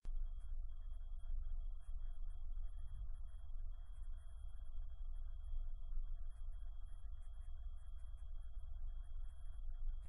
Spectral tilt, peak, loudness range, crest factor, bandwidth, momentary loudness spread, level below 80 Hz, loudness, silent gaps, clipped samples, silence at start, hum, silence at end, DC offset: -6.5 dB/octave; -32 dBFS; 2 LU; 12 dB; 3.5 kHz; 4 LU; -44 dBFS; -55 LUFS; none; under 0.1%; 0.05 s; none; 0 s; under 0.1%